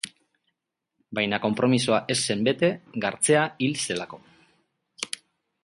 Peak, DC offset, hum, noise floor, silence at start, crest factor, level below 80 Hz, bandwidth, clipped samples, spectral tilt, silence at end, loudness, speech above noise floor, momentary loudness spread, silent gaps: -6 dBFS; under 0.1%; none; -82 dBFS; 0.05 s; 20 dB; -66 dBFS; 11.5 kHz; under 0.1%; -4 dB/octave; 0.6 s; -25 LUFS; 57 dB; 13 LU; none